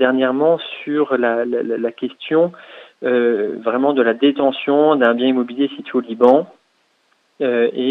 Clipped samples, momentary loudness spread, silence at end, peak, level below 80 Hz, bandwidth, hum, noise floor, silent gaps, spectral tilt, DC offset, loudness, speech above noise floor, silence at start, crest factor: under 0.1%; 9 LU; 0 s; 0 dBFS; -74 dBFS; 4.3 kHz; none; -62 dBFS; none; -7.5 dB/octave; under 0.1%; -17 LUFS; 46 dB; 0 s; 18 dB